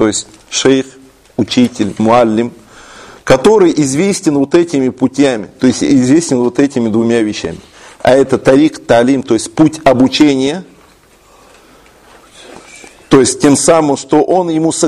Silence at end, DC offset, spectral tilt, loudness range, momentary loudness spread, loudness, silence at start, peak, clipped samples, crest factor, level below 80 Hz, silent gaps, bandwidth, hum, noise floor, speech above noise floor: 0 s; under 0.1%; -5 dB/octave; 4 LU; 9 LU; -11 LUFS; 0 s; 0 dBFS; 0.2%; 12 dB; -44 dBFS; none; 12.5 kHz; none; -45 dBFS; 35 dB